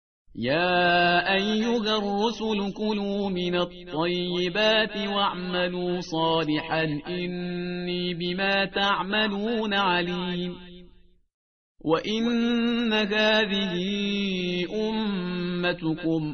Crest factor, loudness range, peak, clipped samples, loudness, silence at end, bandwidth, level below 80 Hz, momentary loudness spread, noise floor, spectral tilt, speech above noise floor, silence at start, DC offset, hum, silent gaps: 16 dB; 3 LU; -8 dBFS; under 0.1%; -25 LUFS; 0 s; 6.6 kHz; -54 dBFS; 9 LU; -55 dBFS; -3 dB/octave; 29 dB; 0.35 s; 0.2%; none; 11.34-11.75 s